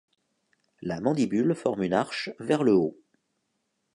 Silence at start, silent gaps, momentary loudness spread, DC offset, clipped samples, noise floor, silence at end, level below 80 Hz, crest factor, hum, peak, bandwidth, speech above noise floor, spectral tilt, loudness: 0.8 s; none; 10 LU; under 0.1%; under 0.1%; -77 dBFS; 1 s; -64 dBFS; 20 dB; none; -8 dBFS; 11 kHz; 52 dB; -6.5 dB/octave; -26 LUFS